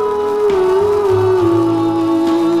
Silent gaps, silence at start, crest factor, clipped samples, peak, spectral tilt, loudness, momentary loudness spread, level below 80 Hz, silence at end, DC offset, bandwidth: none; 0 s; 10 dB; under 0.1%; -4 dBFS; -7.5 dB/octave; -14 LUFS; 2 LU; -44 dBFS; 0 s; 0.2%; 13 kHz